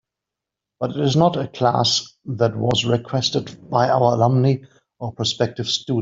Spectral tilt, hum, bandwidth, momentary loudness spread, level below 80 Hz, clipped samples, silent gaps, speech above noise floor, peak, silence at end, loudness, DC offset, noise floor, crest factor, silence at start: -5.5 dB/octave; none; 7.8 kHz; 10 LU; -56 dBFS; under 0.1%; none; 66 dB; -2 dBFS; 0 s; -20 LUFS; under 0.1%; -85 dBFS; 18 dB; 0.8 s